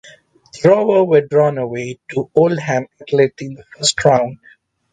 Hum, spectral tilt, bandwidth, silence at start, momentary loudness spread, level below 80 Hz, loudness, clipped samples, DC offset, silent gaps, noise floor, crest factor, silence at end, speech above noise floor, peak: none; -4.5 dB/octave; 9.6 kHz; 0.55 s; 11 LU; -54 dBFS; -16 LUFS; under 0.1%; under 0.1%; none; -46 dBFS; 16 dB; 0.55 s; 30 dB; 0 dBFS